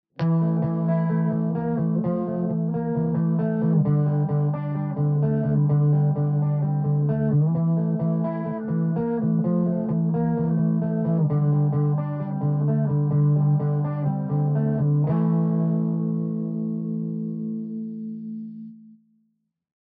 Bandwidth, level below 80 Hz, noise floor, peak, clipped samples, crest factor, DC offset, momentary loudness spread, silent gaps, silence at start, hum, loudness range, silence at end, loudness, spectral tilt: 2.5 kHz; -58 dBFS; -72 dBFS; -10 dBFS; under 0.1%; 12 dB; under 0.1%; 7 LU; none; 0.2 s; none; 4 LU; 1.1 s; -23 LUFS; -12 dB/octave